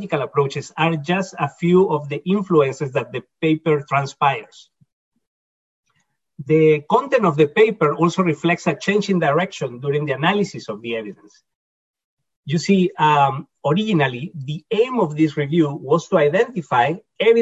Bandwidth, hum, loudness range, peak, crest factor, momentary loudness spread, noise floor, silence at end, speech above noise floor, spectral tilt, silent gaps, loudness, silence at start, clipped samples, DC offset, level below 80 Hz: 8 kHz; none; 5 LU; -4 dBFS; 16 dB; 10 LU; -69 dBFS; 0 s; 50 dB; -6.5 dB/octave; 4.92-5.12 s, 5.27-5.83 s, 11.55-11.94 s, 12.04-12.17 s, 12.37-12.43 s; -19 LUFS; 0 s; under 0.1%; under 0.1%; -62 dBFS